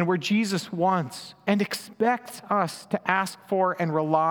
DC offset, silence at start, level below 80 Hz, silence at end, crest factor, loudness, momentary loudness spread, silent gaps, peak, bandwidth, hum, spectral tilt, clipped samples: under 0.1%; 0 s; -76 dBFS; 0 s; 22 dB; -26 LUFS; 6 LU; none; -4 dBFS; over 20 kHz; none; -5.5 dB/octave; under 0.1%